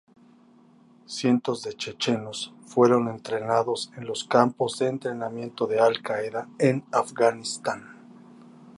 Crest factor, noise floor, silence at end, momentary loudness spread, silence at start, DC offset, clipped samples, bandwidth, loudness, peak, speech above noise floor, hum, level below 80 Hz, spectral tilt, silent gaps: 22 dB; -55 dBFS; 0.05 s; 11 LU; 1.1 s; under 0.1%; under 0.1%; 11.5 kHz; -25 LUFS; -4 dBFS; 30 dB; none; -72 dBFS; -5 dB/octave; none